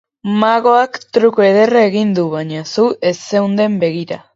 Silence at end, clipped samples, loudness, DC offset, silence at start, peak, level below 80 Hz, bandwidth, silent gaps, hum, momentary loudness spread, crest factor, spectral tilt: 0.2 s; under 0.1%; -14 LUFS; under 0.1%; 0.25 s; 0 dBFS; -62 dBFS; 7.8 kHz; none; none; 9 LU; 14 dB; -6 dB/octave